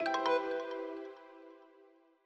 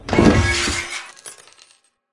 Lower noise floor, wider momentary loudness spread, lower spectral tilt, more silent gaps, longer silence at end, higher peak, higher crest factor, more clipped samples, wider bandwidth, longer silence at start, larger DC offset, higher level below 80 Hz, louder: first, -64 dBFS vs -56 dBFS; about the same, 23 LU vs 23 LU; second, -3 dB/octave vs -4.5 dB/octave; neither; second, 0.6 s vs 0.8 s; second, -20 dBFS vs 0 dBFS; about the same, 18 dB vs 20 dB; neither; second, 8.6 kHz vs 11.5 kHz; about the same, 0 s vs 0.05 s; neither; second, -88 dBFS vs -32 dBFS; second, -36 LUFS vs -18 LUFS